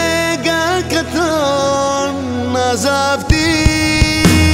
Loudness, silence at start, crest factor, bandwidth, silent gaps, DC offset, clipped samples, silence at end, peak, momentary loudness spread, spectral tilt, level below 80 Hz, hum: -14 LUFS; 0 s; 14 dB; 16.5 kHz; none; under 0.1%; under 0.1%; 0 s; 0 dBFS; 6 LU; -4.5 dB/octave; -24 dBFS; none